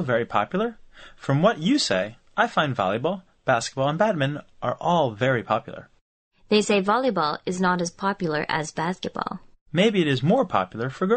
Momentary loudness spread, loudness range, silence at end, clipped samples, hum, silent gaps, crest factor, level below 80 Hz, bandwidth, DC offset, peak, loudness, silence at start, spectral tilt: 9 LU; 1 LU; 0 s; under 0.1%; none; 6.01-6.31 s, 9.61-9.66 s; 20 dB; -58 dBFS; 8.8 kHz; under 0.1%; -4 dBFS; -24 LUFS; 0 s; -5.5 dB/octave